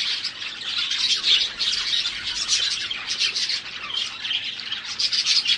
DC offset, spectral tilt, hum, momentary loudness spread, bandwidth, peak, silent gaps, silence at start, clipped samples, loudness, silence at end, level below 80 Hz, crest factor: under 0.1%; 2 dB/octave; none; 9 LU; 11.5 kHz; -6 dBFS; none; 0 s; under 0.1%; -22 LUFS; 0 s; -60 dBFS; 20 dB